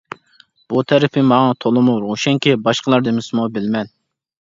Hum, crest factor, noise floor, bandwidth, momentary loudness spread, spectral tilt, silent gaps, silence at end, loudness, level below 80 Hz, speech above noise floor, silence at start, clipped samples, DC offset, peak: none; 16 dB; -53 dBFS; 7.6 kHz; 9 LU; -6 dB/octave; none; 0.65 s; -16 LUFS; -60 dBFS; 37 dB; 0.7 s; under 0.1%; under 0.1%; 0 dBFS